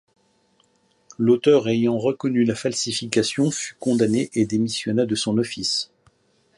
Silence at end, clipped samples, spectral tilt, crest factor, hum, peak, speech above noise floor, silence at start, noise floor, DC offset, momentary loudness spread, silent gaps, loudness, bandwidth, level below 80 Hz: 0.75 s; under 0.1%; -4.5 dB/octave; 18 dB; none; -4 dBFS; 42 dB; 1.2 s; -63 dBFS; under 0.1%; 6 LU; none; -21 LUFS; 11.5 kHz; -60 dBFS